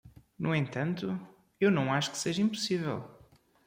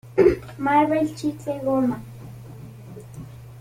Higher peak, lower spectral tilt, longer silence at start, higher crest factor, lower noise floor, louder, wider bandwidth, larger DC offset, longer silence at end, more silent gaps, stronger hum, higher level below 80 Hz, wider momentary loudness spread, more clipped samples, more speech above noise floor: second, -14 dBFS vs -4 dBFS; second, -5 dB/octave vs -7.5 dB/octave; about the same, 0.05 s vs 0.05 s; about the same, 18 dB vs 20 dB; first, -61 dBFS vs -40 dBFS; second, -31 LUFS vs -22 LUFS; about the same, 16 kHz vs 16.5 kHz; neither; first, 0.5 s vs 0 s; neither; neither; second, -68 dBFS vs -48 dBFS; second, 10 LU vs 22 LU; neither; first, 31 dB vs 18 dB